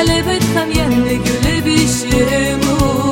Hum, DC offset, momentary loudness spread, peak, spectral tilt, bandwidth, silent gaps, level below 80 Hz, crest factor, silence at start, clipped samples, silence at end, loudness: none; under 0.1%; 2 LU; 0 dBFS; -4.5 dB/octave; 17 kHz; none; -26 dBFS; 12 dB; 0 s; under 0.1%; 0 s; -14 LUFS